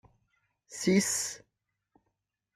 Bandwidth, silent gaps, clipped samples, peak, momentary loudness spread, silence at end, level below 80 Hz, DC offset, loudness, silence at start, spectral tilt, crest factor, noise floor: 15 kHz; none; under 0.1%; -14 dBFS; 20 LU; 1.2 s; -70 dBFS; under 0.1%; -29 LUFS; 0.7 s; -4 dB/octave; 20 dB; -83 dBFS